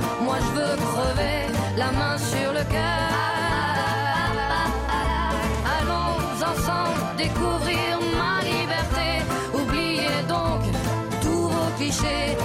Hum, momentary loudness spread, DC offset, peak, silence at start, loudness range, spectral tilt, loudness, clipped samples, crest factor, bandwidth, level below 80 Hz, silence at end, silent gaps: none; 2 LU; under 0.1%; -12 dBFS; 0 s; 1 LU; -4.5 dB/octave; -24 LUFS; under 0.1%; 10 dB; 16 kHz; -34 dBFS; 0 s; none